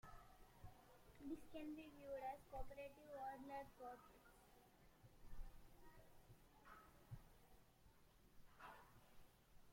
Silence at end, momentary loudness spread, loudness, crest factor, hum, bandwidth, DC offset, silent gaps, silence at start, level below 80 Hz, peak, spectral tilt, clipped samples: 0 s; 16 LU; -58 LUFS; 20 dB; none; 16.5 kHz; under 0.1%; none; 0.05 s; -66 dBFS; -38 dBFS; -6 dB/octave; under 0.1%